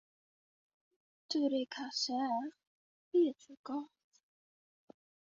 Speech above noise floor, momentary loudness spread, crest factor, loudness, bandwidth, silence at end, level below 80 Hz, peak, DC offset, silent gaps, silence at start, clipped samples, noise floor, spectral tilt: over 55 dB; 13 LU; 18 dB; -36 LUFS; 7.4 kHz; 1.4 s; -88 dBFS; -22 dBFS; under 0.1%; 2.67-3.11 s, 3.57-3.64 s; 1.3 s; under 0.1%; under -90 dBFS; -1 dB/octave